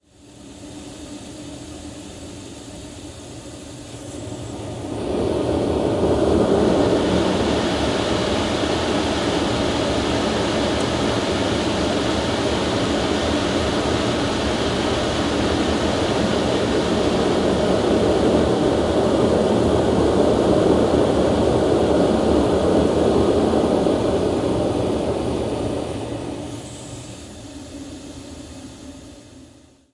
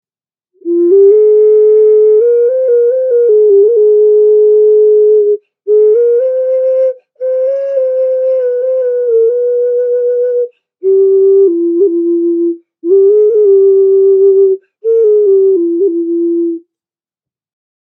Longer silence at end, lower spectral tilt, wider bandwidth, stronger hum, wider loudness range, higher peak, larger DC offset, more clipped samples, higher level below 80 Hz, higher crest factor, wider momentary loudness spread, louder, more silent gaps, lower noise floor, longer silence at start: second, 0.5 s vs 1.3 s; second, -5.5 dB/octave vs -9 dB/octave; first, 11.5 kHz vs 1.7 kHz; neither; first, 16 LU vs 5 LU; second, -4 dBFS vs 0 dBFS; neither; neither; first, -38 dBFS vs -88 dBFS; first, 16 dB vs 8 dB; first, 18 LU vs 8 LU; second, -19 LUFS vs -9 LUFS; neither; second, -48 dBFS vs under -90 dBFS; second, 0.3 s vs 0.65 s